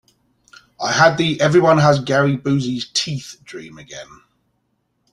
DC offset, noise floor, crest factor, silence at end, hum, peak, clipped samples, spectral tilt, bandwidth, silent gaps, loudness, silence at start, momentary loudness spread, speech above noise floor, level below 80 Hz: under 0.1%; -69 dBFS; 18 dB; 1.1 s; none; -2 dBFS; under 0.1%; -5 dB/octave; 11.5 kHz; none; -16 LUFS; 0.8 s; 22 LU; 51 dB; -54 dBFS